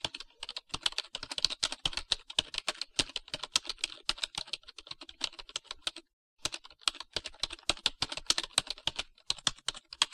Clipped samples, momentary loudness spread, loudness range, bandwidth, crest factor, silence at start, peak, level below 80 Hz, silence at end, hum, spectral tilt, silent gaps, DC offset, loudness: under 0.1%; 10 LU; 5 LU; 16 kHz; 30 dB; 0.05 s; -6 dBFS; -56 dBFS; 0.05 s; none; 0 dB/octave; 6.13-6.36 s; under 0.1%; -34 LUFS